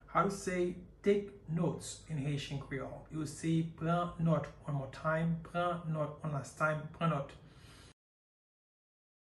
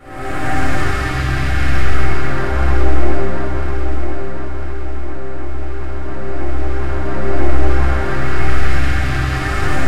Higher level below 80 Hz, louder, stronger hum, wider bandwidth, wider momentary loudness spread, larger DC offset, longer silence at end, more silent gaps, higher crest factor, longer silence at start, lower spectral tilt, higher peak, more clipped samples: second, -60 dBFS vs -20 dBFS; second, -36 LUFS vs -20 LUFS; neither; about the same, 12 kHz vs 12 kHz; about the same, 9 LU vs 10 LU; second, under 0.1% vs 30%; first, 1.3 s vs 0 s; neither; first, 20 dB vs 10 dB; about the same, 0.05 s vs 0 s; about the same, -6.5 dB/octave vs -6.5 dB/octave; second, -18 dBFS vs 0 dBFS; neither